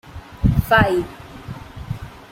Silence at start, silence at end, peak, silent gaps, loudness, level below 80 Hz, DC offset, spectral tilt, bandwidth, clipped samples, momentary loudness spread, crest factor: 0.05 s; 0.05 s; -2 dBFS; none; -18 LUFS; -32 dBFS; under 0.1%; -7 dB/octave; 16.5 kHz; under 0.1%; 20 LU; 18 dB